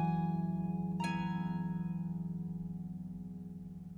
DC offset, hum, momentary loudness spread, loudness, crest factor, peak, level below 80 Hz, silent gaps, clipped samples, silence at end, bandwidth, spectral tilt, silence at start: under 0.1%; none; 11 LU; -39 LUFS; 14 dB; -24 dBFS; -60 dBFS; none; under 0.1%; 0 s; 11 kHz; -8 dB/octave; 0 s